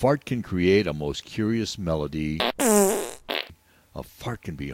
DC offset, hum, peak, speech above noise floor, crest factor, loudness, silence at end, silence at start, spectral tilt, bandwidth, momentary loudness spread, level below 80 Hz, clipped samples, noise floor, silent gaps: under 0.1%; none; -2 dBFS; 28 dB; 24 dB; -25 LUFS; 0 s; 0 s; -4.5 dB/octave; 17 kHz; 15 LU; -46 dBFS; under 0.1%; -52 dBFS; none